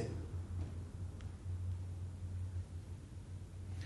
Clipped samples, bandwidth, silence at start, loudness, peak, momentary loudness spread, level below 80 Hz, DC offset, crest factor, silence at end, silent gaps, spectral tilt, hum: under 0.1%; 11.5 kHz; 0 s; -46 LUFS; -30 dBFS; 7 LU; -54 dBFS; under 0.1%; 14 dB; 0 s; none; -7.5 dB/octave; none